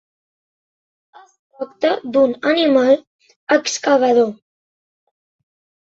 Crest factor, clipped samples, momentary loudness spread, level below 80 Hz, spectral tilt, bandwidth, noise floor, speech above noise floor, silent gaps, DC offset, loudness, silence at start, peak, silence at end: 18 dB; under 0.1%; 10 LU; -66 dBFS; -3 dB/octave; 8 kHz; under -90 dBFS; over 74 dB; 3.07-3.19 s, 3.36-3.47 s; under 0.1%; -16 LUFS; 1.6 s; -2 dBFS; 1.5 s